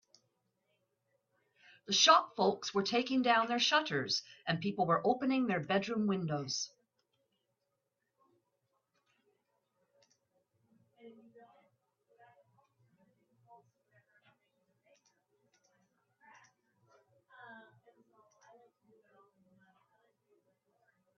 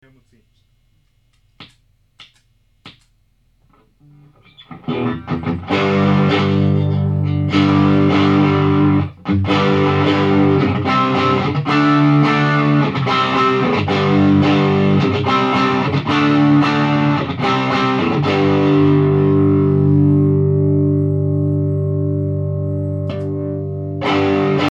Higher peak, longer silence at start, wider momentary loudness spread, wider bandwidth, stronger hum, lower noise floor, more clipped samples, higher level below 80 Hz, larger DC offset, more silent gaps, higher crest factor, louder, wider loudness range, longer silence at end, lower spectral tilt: second, -12 dBFS vs -2 dBFS; first, 1.9 s vs 1.6 s; first, 11 LU vs 8 LU; about the same, 7.2 kHz vs 7.2 kHz; neither; first, -85 dBFS vs -59 dBFS; neither; second, -82 dBFS vs -52 dBFS; neither; neither; first, 26 dB vs 14 dB; second, -32 LUFS vs -15 LUFS; first, 11 LU vs 5 LU; first, 3.55 s vs 0 s; second, -2.5 dB/octave vs -8 dB/octave